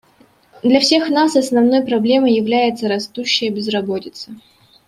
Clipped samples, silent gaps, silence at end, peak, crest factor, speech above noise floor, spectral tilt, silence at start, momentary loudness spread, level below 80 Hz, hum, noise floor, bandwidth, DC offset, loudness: under 0.1%; none; 0.5 s; -2 dBFS; 16 dB; 37 dB; -4 dB/octave; 0.65 s; 11 LU; -60 dBFS; none; -52 dBFS; 13.5 kHz; under 0.1%; -16 LUFS